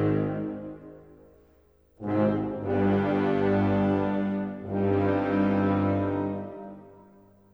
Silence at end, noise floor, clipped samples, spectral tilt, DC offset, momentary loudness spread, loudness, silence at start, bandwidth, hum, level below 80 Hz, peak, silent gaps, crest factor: 0.6 s; -61 dBFS; under 0.1%; -10 dB/octave; under 0.1%; 14 LU; -26 LUFS; 0 s; 5.6 kHz; none; -56 dBFS; -12 dBFS; none; 14 dB